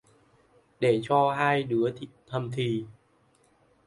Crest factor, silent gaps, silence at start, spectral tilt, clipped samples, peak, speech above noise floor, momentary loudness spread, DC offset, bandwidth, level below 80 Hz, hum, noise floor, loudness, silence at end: 18 dB; none; 0.8 s; -7 dB/octave; under 0.1%; -10 dBFS; 38 dB; 12 LU; under 0.1%; 11.5 kHz; -68 dBFS; none; -65 dBFS; -27 LUFS; 0.95 s